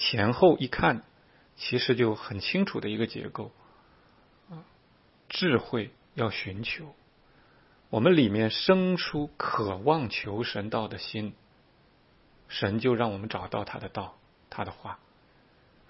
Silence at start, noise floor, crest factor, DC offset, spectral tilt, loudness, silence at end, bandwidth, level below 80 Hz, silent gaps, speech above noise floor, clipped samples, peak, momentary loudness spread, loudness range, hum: 0 s; -62 dBFS; 22 dB; under 0.1%; -9 dB/octave; -28 LUFS; 0.95 s; 6 kHz; -58 dBFS; none; 34 dB; under 0.1%; -8 dBFS; 17 LU; 7 LU; none